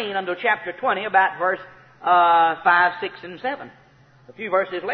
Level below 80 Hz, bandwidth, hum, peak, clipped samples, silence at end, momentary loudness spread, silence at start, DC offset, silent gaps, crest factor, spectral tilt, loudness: -68 dBFS; 5.6 kHz; none; -4 dBFS; under 0.1%; 0 s; 14 LU; 0 s; under 0.1%; none; 16 dB; -6.5 dB/octave; -20 LUFS